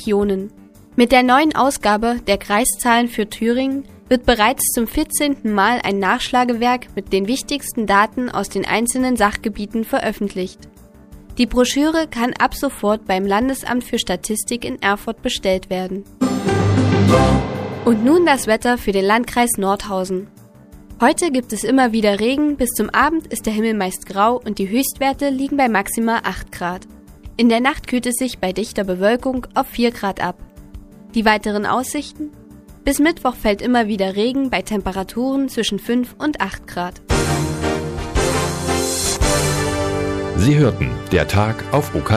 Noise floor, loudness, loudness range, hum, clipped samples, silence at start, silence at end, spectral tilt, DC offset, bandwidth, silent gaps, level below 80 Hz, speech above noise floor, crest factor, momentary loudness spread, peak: -42 dBFS; -18 LUFS; 4 LU; none; under 0.1%; 0 s; 0 s; -4.5 dB/octave; under 0.1%; 15.5 kHz; none; -36 dBFS; 25 dB; 18 dB; 9 LU; 0 dBFS